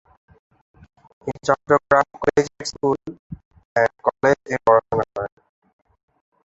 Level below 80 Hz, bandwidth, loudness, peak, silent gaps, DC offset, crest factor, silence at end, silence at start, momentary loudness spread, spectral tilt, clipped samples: -52 dBFS; 8.2 kHz; -20 LUFS; -2 dBFS; 3.19-3.30 s, 3.45-3.51 s, 3.65-3.75 s; under 0.1%; 20 dB; 1.25 s; 1.25 s; 17 LU; -5 dB/octave; under 0.1%